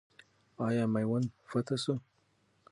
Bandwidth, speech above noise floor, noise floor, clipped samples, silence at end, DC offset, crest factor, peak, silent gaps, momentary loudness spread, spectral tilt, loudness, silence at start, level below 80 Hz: 11.5 kHz; 40 dB; -72 dBFS; under 0.1%; 0.7 s; under 0.1%; 16 dB; -18 dBFS; none; 6 LU; -6.5 dB/octave; -34 LUFS; 0.6 s; -72 dBFS